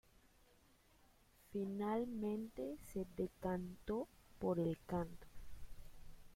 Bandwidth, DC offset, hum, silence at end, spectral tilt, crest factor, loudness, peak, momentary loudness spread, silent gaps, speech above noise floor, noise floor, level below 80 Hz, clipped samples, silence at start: 16.5 kHz; under 0.1%; none; 0 s; -8 dB/octave; 18 dB; -44 LUFS; -26 dBFS; 21 LU; none; 28 dB; -71 dBFS; -62 dBFS; under 0.1%; 0.25 s